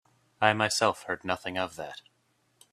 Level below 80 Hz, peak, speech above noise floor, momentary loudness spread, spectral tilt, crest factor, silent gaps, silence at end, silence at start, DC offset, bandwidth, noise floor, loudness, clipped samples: -68 dBFS; -4 dBFS; 42 dB; 16 LU; -3 dB/octave; 26 dB; none; 0.75 s; 0.4 s; under 0.1%; 15 kHz; -71 dBFS; -28 LUFS; under 0.1%